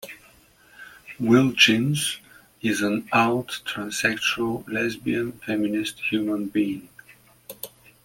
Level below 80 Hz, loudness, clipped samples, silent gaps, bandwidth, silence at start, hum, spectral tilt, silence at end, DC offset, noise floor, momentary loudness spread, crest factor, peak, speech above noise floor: -60 dBFS; -23 LUFS; under 0.1%; none; 17 kHz; 0 s; none; -4 dB/octave; 0.35 s; under 0.1%; -55 dBFS; 21 LU; 22 dB; -2 dBFS; 32 dB